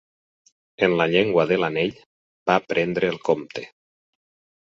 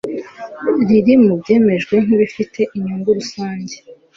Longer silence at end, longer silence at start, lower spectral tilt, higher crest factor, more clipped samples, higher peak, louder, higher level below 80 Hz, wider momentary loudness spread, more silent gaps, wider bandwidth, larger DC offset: first, 1 s vs 0.25 s; first, 0.8 s vs 0.05 s; about the same, -6.5 dB/octave vs -7 dB/octave; first, 22 dB vs 14 dB; neither; about the same, -2 dBFS vs -2 dBFS; second, -22 LUFS vs -15 LUFS; second, -60 dBFS vs -54 dBFS; second, 11 LU vs 16 LU; first, 2.06-2.46 s vs none; about the same, 7.4 kHz vs 7.6 kHz; neither